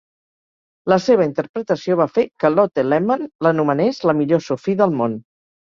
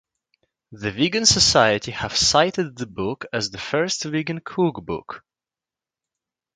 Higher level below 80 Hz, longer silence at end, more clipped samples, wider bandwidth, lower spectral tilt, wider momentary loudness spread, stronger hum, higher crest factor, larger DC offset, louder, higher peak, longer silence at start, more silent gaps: second, -60 dBFS vs -48 dBFS; second, 0.4 s vs 1.35 s; neither; second, 7.4 kHz vs 11 kHz; first, -7.5 dB/octave vs -3 dB/octave; second, 6 LU vs 16 LU; neither; second, 16 dB vs 22 dB; neither; about the same, -18 LUFS vs -20 LUFS; about the same, -2 dBFS vs 0 dBFS; first, 0.85 s vs 0.7 s; first, 1.49-1.54 s, 3.35-3.39 s vs none